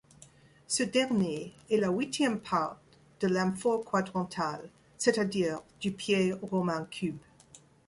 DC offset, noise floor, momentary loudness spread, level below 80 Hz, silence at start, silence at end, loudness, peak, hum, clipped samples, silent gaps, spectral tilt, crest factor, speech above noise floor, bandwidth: under 0.1%; -58 dBFS; 9 LU; -66 dBFS; 0.7 s; 0.3 s; -31 LUFS; -10 dBFS; none; under 0.1%; none; -4.5 dB/octave; 22 dB; 28 dB; 11.5 kHz